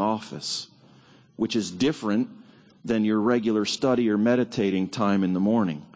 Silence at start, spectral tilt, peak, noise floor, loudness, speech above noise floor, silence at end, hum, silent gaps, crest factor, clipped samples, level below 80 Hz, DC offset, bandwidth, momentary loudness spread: 0 s; -5.5 dB/octave; -10 dBFS; -54 dBFS; -25 LUFS; 30 dB; 0.1 s; none; none; 16 dB; under 0.1%; -62 dBFS; under 0.1%; 8 kHz; 8 LU